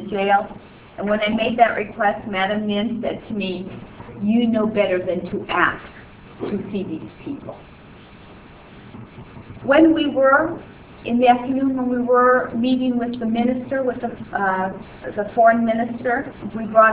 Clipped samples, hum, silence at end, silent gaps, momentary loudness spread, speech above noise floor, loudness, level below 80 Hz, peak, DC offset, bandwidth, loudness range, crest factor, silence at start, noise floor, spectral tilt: under 0.1%; none; 0 s; none; 19 LU; 24 dB; -20 LUFS; -50 dBFS; 0 dBFS; under 0.1%; 4 kHz; 8 LU; 20 dB; 0 s; -43 dBFS; -9.5 dB/octave